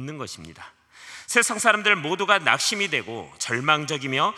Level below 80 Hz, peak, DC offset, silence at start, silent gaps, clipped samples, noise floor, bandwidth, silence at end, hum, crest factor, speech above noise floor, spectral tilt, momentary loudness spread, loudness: -70 dBFS; 0 dBFS; under 0.1%; 0 s; none; under 0.1%; -45 dBFS; 15 kHz; 0 s; none; 24 dB; 21 dB; -2 dB/octave; 18 LU; -21 LUFS